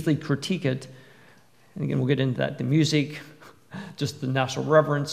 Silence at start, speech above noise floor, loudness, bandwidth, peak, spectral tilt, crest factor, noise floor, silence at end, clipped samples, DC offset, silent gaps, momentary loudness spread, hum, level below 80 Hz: 0 s; 32 dB; -25 LUFS; 14.5 kHz; -4 dBFS; -6 dB/octave; 22 dB; -57 dBFS; 0 s; under 0.1%; 0.1%; none; 20 LU; none; -68 dBFS